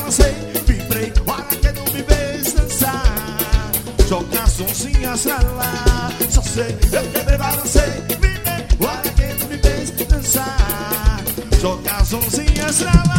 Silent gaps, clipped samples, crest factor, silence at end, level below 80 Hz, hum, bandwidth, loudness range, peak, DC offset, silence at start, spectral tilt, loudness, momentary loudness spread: none; under 0.1%; 16 dB; 0 s; -18 dBFS; none; 17 kHz; 1 LU; 0 dBFS; under 0.1%; 0 s; -4 dB/octave; -18 LUFS; 4 LU